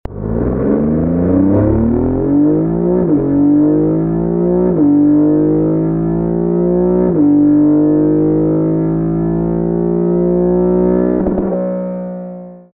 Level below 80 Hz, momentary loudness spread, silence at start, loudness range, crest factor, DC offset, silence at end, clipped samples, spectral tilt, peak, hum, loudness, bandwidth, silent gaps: -32 dBFS; 6 LU; 0.1 s; 2 LU; 12 dB; under 0.1%; 0.15 s; under 0.1%; -15 dB/octave; 0 dBFS; none; -13 LUFS; 2.5 kHz; none